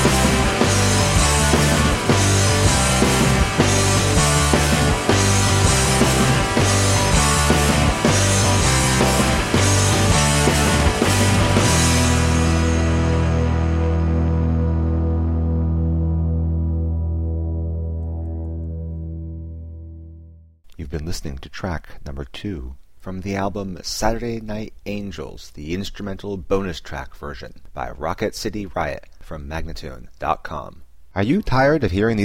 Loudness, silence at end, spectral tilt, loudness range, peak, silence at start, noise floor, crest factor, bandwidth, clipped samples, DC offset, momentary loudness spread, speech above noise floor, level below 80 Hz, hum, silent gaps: -18 LUFS; 0 s; -4.5 dB/octave; 13 LU; 0 dBFS; 0 s; -44 dBFS; 18 dB; 16 kHz; under 0.1%; under 0.1%; 17 LU; 20 dB; -26 dBFS; none; none